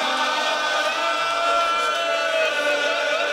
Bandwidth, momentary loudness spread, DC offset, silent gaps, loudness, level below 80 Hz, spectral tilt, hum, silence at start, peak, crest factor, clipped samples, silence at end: 16 kHz; 2 LU; under 0.1%; none; -20 LUFS; -64 dBFS; 0 dB/octave; none; 0 s; -8 dBFS; 12 dB; under 0.1%; 0 s